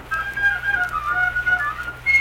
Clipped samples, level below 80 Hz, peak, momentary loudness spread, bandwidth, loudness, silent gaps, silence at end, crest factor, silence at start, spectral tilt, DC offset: under 0.1%; -42 dBFS; -8 dBFS; 6 LU; 17 kHz; -20 LUFS; none; 0 s; 14 dB; 0 s; -3 dB/octave; under 0.1%